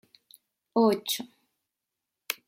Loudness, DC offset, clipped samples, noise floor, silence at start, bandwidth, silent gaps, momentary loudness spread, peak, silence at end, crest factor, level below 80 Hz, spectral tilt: -27 LUFS; under 0.1%; under 0.1%; -86 dBFS; 0.75 s; 16.5 kHz; none; 13 LU; -8 dBFS; 0.15 s; 22 dB; -80 dBFS; -3.5 dB/octave